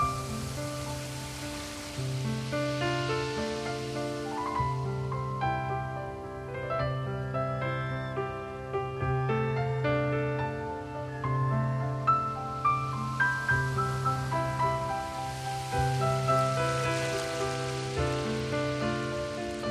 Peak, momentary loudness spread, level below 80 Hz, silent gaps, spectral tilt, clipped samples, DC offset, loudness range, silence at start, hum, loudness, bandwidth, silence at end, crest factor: -14 dBFS; 8 LU; -48 dBFS; none; -5.5 dB/octave; under 0.1%; under 0.1%; 4 LU; 0 s; none; -31 LUFS; 13.5 kHz; 0 s; 16 dB